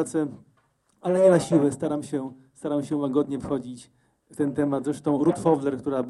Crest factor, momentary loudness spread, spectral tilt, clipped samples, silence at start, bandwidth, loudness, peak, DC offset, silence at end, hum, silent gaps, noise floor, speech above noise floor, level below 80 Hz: 18 dB; 14 LU; -7 dB/octave; under 0.1%; 0 s; 12 kHz; -25 LUFS; -6 dBFS; under 0.1%; 0 s; none; none; -67 dBFS; 43 dB; -62 dBFS